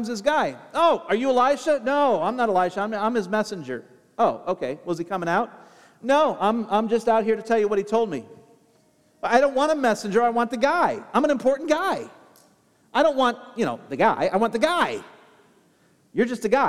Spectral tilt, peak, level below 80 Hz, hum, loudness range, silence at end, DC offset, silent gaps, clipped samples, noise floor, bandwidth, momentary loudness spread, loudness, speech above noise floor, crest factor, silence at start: -5 dB/octave; -2 dBFS; -62 dBFS; none; 3 LU; 0 s; 0.2%; none; under 0.1%; -61 dBFS; 14 kHz; 9 LU; -23 LUFS; 38 dB; 20 dB; 0 s